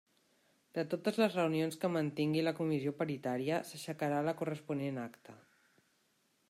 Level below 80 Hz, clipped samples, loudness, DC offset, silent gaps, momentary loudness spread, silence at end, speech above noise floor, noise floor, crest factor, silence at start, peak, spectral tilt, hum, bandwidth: -80 dBFS; under 0.1%; -36 LUFS; under 0.1%; none; 8 LU; 1.15 s; 40 dB; -76 dBFS; 18 dB; 0.75 s; -18 dBFS; -6.5 dB/octave; none; 15.5 kHz